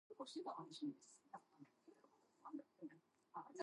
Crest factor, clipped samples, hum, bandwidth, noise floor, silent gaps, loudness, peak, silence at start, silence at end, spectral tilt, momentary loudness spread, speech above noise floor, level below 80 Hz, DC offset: 22 dB; under 0.1%; none; 11 kHz; -75 dBFS; none; -55 LUFS; -34 dBFS; 0.1 s; 0 s; -4.5 dB/octave; 14 LU; 22 dB; under -90 dBFS; under 0.1%